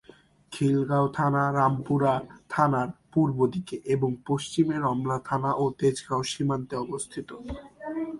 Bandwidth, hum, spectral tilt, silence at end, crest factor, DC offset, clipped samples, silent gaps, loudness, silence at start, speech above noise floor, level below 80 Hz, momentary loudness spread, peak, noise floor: 11.5 kHz; none; -6.5 dB/octave; 0 s; 18 dB; under 0.1%; under 0.1%; none; -27 LUFS; 0.5 s; 29 dB; -56 dBFS; 11 LU; -8 dBFS; -55 dBFS